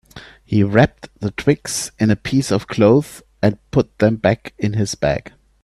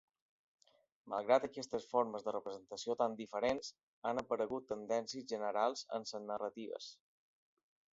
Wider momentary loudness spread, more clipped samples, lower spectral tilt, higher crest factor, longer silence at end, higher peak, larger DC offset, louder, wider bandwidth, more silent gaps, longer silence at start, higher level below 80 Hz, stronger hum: about the same, 9 LU vs 11 LU; neither; first, -6 dB/octave vs -3 dB/octave; about the same, 18 dB vs 22 dB; second, 0.35 s vs 1 s; first, 0 dBFS vs -18 dBFS; neither; first, -18 LUFS vs -39 LUFS; first, 13.5 kHz vs 7.6 kHz; second, none vs 3.83-4.02 s; second, 0.15 s vs 1.05 s; first, -44 dBFS vs -78 dBFS; neither